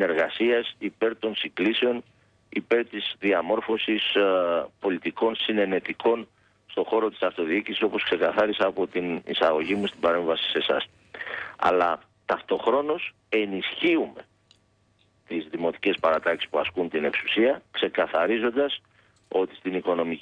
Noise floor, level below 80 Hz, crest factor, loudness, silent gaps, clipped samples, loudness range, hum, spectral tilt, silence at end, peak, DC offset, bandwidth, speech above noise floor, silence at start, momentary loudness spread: -65 dBFS; -66 dBFS; 16 dB; -25 LUFS; none; under 0.1%; 3 LU; none; -6 dB/octave; 0 s; -10 dBFS; under 0.1%; 8.6 kHz; 40 dB; 0 s; 7 LU